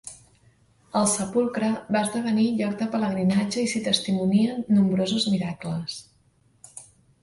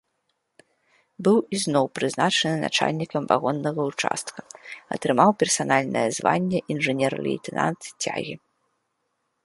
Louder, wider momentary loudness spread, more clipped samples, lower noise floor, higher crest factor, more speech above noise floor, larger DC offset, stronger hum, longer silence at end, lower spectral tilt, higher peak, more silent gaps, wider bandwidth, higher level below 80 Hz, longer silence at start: about the same, -24 LUFS vs -23 LUFS; first, 14 LU vs 11 LU; neither; second, -62 dBFS vs -75 dBFS; about the same, 18 dB vs 22 dB; second, 39 dB vs 52 dB; neither; neither; second, 0.4 s vs 1.05 s; about the same, -5 dB/octave vs -4 dB/octave; second, -8 dBFS vs -2 dBFS; neither; about the same, 11.5 kHz vs 11.5 kHz; first, -62 dBFS vs -68 dBFS; second, 0.05 s vs 1.2 s